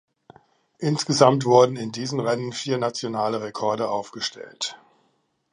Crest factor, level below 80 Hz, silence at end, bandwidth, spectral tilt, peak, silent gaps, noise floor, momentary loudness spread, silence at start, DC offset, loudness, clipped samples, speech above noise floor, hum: 22 dB; -70 dBFS; 0.75 s; 11 kHz; -5 dB/octave; -2 dBFS; none; -69 dBFS; 13 LU; 0.8 s; under 0.1%; -23 LUFS; under 0.1%; 46 dB; none